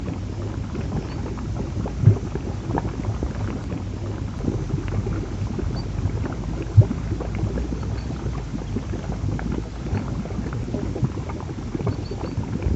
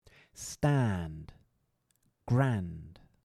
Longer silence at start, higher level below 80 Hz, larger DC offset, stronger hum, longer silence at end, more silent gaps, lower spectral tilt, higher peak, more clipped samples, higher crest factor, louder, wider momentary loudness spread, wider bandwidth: second, 0 s vs 0.35 s; first, -32 dBFS vs -58 dBFS; neither; neither; second, 0 s vs 0.35 s; neither; about the same, -8 dB/octave vs -7 dB/octave; first, -2 dBFS vs -14 dBFS; neither; about the same, 22 dB vs 20 dB; first, -26 LUFS vs -32 LUFS; second, 10 LU vs 20 LU; second, 8 kHz vs 13 kHz